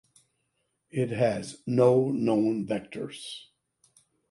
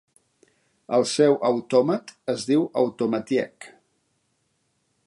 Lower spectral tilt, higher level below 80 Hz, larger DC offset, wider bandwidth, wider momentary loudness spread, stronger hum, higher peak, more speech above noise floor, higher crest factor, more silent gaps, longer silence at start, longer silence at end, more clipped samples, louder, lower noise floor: first, -7 dB/octave vs -5 dB/octave; first, -68 dBFS vs -74 dBFS; neither; about the same, 11.5 kHz vs 11.5 kHz; first, 16 LU vs 9 LU; neither; about the same, -8 dBFS vs -6 dBFS; about the same, 51 dB vs 49 dB; about the same, 20 dB vs 18 dB; neither; about the same, 0.95 s vs 0.9 s; second, 0.9 s vs 1.4 s; neither; second, -27 LUFS vs -23 LUFS; first, -77 dBFS vs -71 dBFS